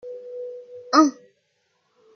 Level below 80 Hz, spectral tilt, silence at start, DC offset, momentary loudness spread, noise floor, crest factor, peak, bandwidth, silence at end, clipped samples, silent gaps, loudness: -82 dBFS; -2 dB/octave; 0.05 s; under 0.1%; 19 LU; -70 dBFS; 22 dB; -4 dBFS; 6.6 kHz; 1.05 s; under 0.1%; none; -19 LUFS